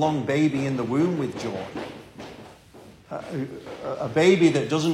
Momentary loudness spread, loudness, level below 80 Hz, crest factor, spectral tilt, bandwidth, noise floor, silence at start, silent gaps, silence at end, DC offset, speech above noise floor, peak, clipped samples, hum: 21 LU; -24 LUFS; -60 dBFS; 18 dB; -6 dB/octave; 12.5 kHz; -48 dBFS; 0 s; none; 0 s; under 0.1%; 25 dB; -6 dBFS; under 0.1%; none